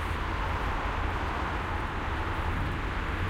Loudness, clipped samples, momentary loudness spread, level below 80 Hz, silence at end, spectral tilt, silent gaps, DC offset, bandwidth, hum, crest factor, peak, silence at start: -32 LUFS; under 0.1%; 1 LU; -36 dBFS; 0 s; -6 dB/octave; none; under 0.1%; 15.5 kHz; none; 12 dB; -18 dBFS; 0 s